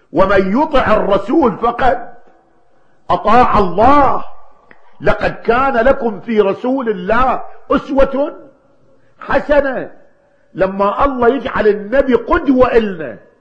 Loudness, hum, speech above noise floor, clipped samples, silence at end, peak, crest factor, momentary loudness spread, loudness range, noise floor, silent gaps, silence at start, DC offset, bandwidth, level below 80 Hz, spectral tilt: -14 LUFS; none; 43 dB; 0.1%; 0.2 s; 0 dBFS; 14 dB; 10 LU; 4 LU; -55 dBFS; none; 0.15 s; under 0.1%; 8 kHz; -30 dBFS; -7.5 dB/octave